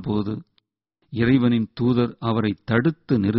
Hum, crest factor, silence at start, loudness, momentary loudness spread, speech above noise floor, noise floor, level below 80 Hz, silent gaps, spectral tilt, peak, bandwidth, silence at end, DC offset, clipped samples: none; 16 dB; 0 s; -22 LUFS; 9 LU; 51 dB; -72 dBFS; -50 dBFS; none; -7 dB/octave; -6 dBFS; 5.8 kHz; 0 s; under 0.1%; under 0.1%